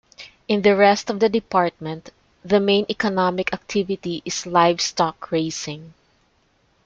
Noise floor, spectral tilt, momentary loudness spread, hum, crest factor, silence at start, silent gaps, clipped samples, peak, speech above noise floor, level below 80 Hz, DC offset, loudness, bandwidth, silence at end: -63 dBFS; -4.5 dB/octave; 15 LU; none; 20 dB; 0.2 s; none; under 0.1%; -2 dBFS; 42 dB; -58 dBFS; under 0.1%; -20 LUFS; 8.6 kHz; 0.95 s